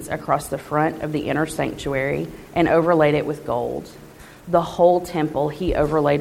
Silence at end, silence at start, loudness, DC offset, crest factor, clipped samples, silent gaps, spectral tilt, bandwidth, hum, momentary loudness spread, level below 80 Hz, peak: 0 s; 0 s; -21 LUFS; under 0.1%; 18 dB; under 0.1%; none; -6.5 dB/octave; 16.5 kHz; none; 9 LU; -42 dBFS; -4 dBFS